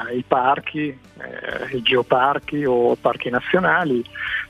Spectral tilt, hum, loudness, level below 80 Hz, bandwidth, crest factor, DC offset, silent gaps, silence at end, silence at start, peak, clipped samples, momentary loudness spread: -6.5 dB/octave; none; -20 LUFS; -54 dBFS; 11.5 kHz; 18 dB; under 0.1%; none; 0.05 s; 0 s; -2 dBFS; under 0.1%; 12 LU